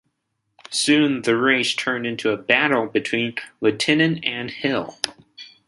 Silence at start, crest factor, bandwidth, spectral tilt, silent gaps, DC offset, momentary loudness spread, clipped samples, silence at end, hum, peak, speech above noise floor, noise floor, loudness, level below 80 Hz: 0.7 s; 22 dB; 11.5 kHz; -4 dB/octave; none; under 0.1%; 9 LU; under 0.1%; 0.2 s; none; 0 dBFS; 54 dB; -75 dBFS; -20 LUFS; -64 dBFS